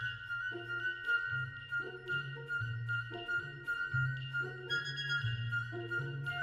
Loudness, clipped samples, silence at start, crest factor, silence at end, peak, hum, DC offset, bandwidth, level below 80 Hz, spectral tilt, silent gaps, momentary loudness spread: -37 LUFS; under 0.1%; 0 s; 14 dB; 0 s; -24 dBFS; none; under 0.1%; 12 kHz; -66 dBFS; -5 dB/octave; none; 5 LU